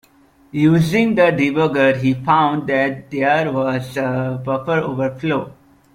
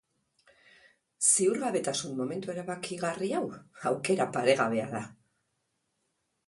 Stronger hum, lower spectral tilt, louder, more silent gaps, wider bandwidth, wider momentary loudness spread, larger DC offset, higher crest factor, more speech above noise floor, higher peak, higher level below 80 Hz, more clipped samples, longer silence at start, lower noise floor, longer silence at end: neither; first, -7 dB/octave vs -3.5 dB/octave; first, -17 LUFS vs -29 LUFS; neither; first, 15.5 kHz vs 11.5 kHz; second, 7 LU vs 12 LU; neither; second, 16 dB vs 22 dB; second, 35 dB vs 49 dB; first, -2 dBFS vs -8 dBFS; first, -52 dBFS vs -74 dBFS; neither; second, 0.55 s vs 1.2 s; second, -52 dBFS vs -79 dBFS; second, 0.4 s vs 1.35 s